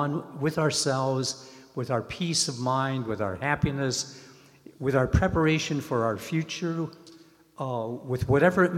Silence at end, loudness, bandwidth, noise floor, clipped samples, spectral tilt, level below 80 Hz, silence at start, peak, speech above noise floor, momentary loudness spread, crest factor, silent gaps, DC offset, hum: 0 s; -27 LUFS; 16 kHz; -54 dBFS; under 0.1%; -5 dB/octave; -46 dBFS; 0 s; -8 dBFS; 27 dB; 10 LU; 20 dB; none; under 0.1%; none